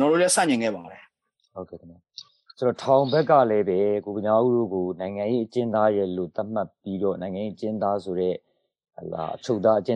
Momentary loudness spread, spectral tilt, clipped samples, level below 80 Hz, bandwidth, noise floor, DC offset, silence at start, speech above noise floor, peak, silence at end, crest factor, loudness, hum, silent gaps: 20 LU; -5 dB/octave; under 0.1%; -68 dBFS; 11.5 kHz; -68 dBFS; under 0.1%; 0 s; 45 dB; -6 dBFS; 0 s; 20 dB; -24 LUFS; none; none